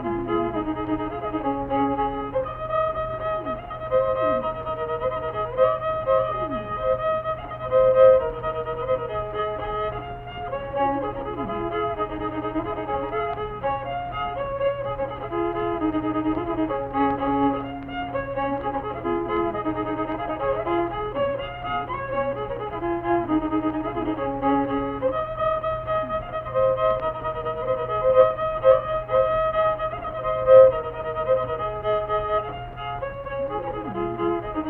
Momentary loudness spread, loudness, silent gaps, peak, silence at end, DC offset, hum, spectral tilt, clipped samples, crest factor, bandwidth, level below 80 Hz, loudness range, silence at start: 8 LU; -24 LUFS; none; -4 dBFS; 0 s; under 0.1%; none; -9.5 dB/octave; under 0.1%; 20 dB; 4 kHz; -44 dBFS; 7 LU; 0 s